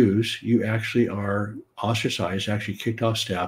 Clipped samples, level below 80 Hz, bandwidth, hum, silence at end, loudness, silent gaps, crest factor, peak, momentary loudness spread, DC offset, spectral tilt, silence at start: under 0.1%; -60 dBFS; 16 kHz; none; 0 s; -25 LUFS; none; 16 dB; -8 dBFS; 6 LU; under 0.1%; -5.5 dB/octave; 0 s